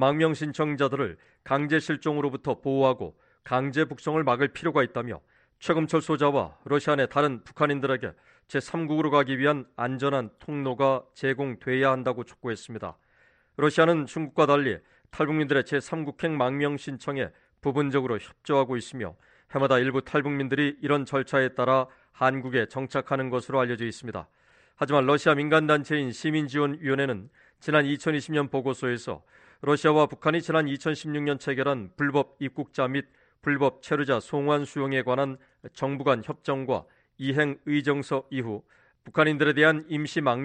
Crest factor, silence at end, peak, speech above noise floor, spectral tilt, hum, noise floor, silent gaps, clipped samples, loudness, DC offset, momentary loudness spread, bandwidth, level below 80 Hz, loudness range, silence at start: 20 dB; 0 s; -6 dBFS; 37 dB; -6.5 dB/octave; none; -63 dBFS; none; under 0.1%; -26 LUFS; under 0.1%; 11 LU; 9.4 kHz; -64 dBFS; 3 LU; 0 s